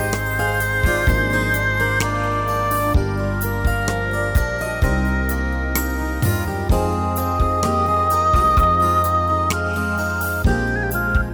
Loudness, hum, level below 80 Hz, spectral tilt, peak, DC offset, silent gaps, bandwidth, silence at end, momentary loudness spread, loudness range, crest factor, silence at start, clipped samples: -19 LUFS; none; -26 dBFS; -5.5 dB/octave; -4 dBFS; under 0.1%; none; over 20 kHz; 0 s; 6 LU; 3 LU; 14 dB; 0 s; under 0.1%